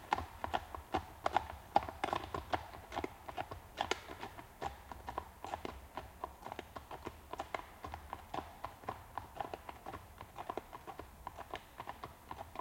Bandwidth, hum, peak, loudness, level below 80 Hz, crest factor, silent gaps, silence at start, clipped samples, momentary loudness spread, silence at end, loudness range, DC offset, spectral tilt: 16.5 kHz; none; -12 dBFS; -44 LUFS; -60 dBFS; 32 dB; none; 0 s; under 0.1%; 12 LU; 0 s; 8 LU; under 0.1%; -4.5 dB/octave